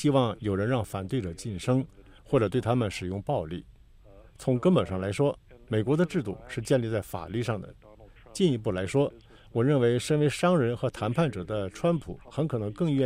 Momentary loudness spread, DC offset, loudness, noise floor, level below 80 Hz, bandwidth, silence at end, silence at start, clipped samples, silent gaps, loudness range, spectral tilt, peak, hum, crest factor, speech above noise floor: 10 LU; under 0.1%; -28 LUFS; -53 dBFS; -54 dBFS; 15.5 kHz; 0 s; 0 s; under 0.1%; none; 3 LU; -7 dB/octave; -10 dBFS; none; 18 dB; 26 dB